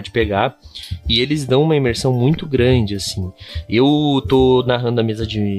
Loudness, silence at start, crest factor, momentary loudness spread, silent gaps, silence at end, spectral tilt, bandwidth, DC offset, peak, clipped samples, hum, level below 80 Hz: -16 LUFS; 0 s; 14 dB; 12 LU; none; 0 s; -6 dB/octave; 13.5 kHz; under 0.1%; -2 dBFS; under 0.1%; none; -34 dBFS